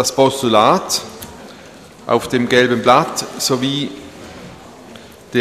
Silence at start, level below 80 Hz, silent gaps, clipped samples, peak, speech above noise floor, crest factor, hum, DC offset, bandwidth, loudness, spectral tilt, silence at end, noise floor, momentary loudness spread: 0 s; -52 dBFS; none; under 0.1%; 0 dBFS; 24 dB; 18 dB; none; under 0.1%; 15.5 kHz; -15 LUFS; -3.5 dB/octave; 0 s; -39 dBFS; 22 LU